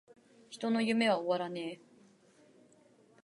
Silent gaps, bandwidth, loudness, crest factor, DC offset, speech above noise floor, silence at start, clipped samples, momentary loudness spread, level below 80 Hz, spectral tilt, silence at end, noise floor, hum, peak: none; 11.5 kHz; -33 LUFS; 20 dB; under 0.1%; 32 dB; 0.5 s; under 0.1%; 19 LU; -88 dBFS; -5 dB/octave; 1.5 s; -64 dBFS; none; -16 dBFS